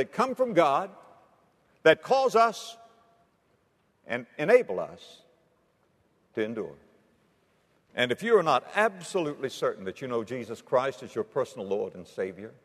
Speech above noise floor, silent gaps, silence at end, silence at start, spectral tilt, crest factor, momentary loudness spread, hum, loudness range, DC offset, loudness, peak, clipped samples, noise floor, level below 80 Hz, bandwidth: 42 dB; none; 0.15 s; 0 s; -4.5 dB/octave; 22 dB; 14 LU; none; 5 LU; under 0.1%; -27 LUFS; -6 dBFS; under 0.1%; -69 dBFS; -76 dBFS; 13.5 kHz